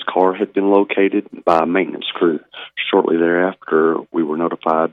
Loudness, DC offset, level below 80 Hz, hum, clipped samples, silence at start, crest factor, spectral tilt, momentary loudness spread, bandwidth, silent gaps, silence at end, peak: -17 LUFS; under 0.1%; -66 dBFS; none; under 0.1%; 0 s; 16 dB; -7.5 dB/octave; 6 LU; 6 kHz; none; 0.05 s; -2 dBFS